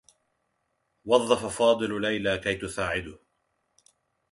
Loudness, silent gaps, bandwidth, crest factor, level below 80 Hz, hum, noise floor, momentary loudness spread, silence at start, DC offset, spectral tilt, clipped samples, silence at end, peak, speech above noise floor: -26 LUFS; none; 11.5 kHz; 24 dB; -56 dBFS; none; -76 dBFS; 9 LU; 1.05 s; under 0.1%; -4 dB/octave; under 0.1%; 1.15 s; -6 dBFS; 50 dB